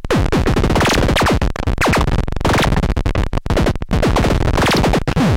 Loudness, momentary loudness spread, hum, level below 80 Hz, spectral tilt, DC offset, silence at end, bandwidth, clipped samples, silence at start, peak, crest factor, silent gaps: -16 LUFS; 5 LU; none; -20 dBFS; -5.5 dB/octave; under 0.1%; 0 s; 16.5 kHz; under 0.1%; 0 s; -4 dBFS; 12 dB; none